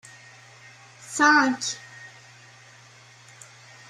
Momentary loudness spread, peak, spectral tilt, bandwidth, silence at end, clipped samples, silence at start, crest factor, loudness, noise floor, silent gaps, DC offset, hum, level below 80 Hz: 29 LU; -6 dBFS; -2 dB/octave; 13 kHz; 1.85 s; under 0.1%; 1.1 s; 22 dB; -21 LUFS; -51 dBFS; none; under 0.1%; none; -78 dBFS